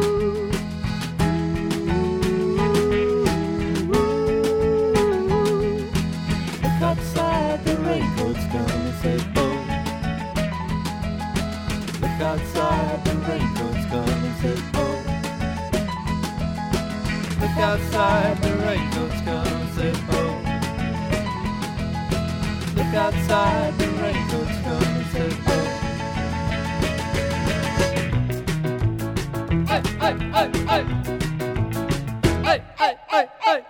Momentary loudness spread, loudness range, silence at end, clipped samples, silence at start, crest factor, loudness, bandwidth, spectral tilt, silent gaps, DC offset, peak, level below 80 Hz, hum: 6 LU; 4 LU; 0 s; under 0.1%; 0 s; 18 dB; -23 LUFS; 17.5 kHz; -6 dB/octave; none; under 0.1%; -4 dBFS; -34 dBFS; none